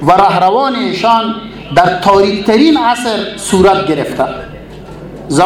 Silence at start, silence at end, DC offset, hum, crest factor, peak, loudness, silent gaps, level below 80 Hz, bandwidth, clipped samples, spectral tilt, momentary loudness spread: 0 s; 0 s; under 0.1%; none; 10 dB; 0 dBFS; -11 LUFS; none; -38 dBFS; 15 kHz; 0.3%; -5 dB/octave; 20 LU